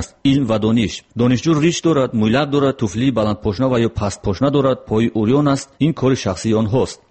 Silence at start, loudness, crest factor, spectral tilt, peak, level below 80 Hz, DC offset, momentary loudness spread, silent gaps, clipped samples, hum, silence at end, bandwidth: 0 s; -17 LUFS; 12 dB; -6.5 dB/octave; -4 dBFS; -42 dBFS; 0.1%; 4 LU; none; under 0.1%; none; 0.15 s; 8.8 kHz